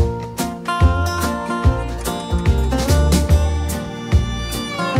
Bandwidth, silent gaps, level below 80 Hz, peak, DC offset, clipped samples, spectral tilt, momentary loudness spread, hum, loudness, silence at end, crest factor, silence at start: 16 kHz; none; -22 dBFS; -4 dBFS; under 0.1%; under 0.1%; -5.5 dB/octave; 8 LU; none; -19 LUFS; 0 s; 12 dB; 0 s